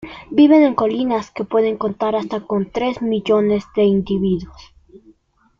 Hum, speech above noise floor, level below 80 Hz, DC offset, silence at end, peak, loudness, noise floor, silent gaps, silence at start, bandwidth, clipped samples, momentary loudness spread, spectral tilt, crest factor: none; 38 dB; -48 dBFS; under 0.1%; 1.1 s; -2 dBFS; -17 LUFS; -55 dBFS; none; 0 s; 7.2 kHz; under 0.1%; 10 LU; -8 dB/octave; 16 dB